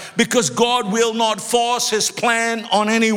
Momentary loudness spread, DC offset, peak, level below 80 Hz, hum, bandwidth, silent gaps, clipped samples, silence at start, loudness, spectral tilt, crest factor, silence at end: 2 LU; under 0.1%; -2 dBFS; -60 dBFS; none; 17.5 kHz; none; under 0.1%; 0 s; -17 LUFS; -2.5 dB/octave; 16 dB; 0 s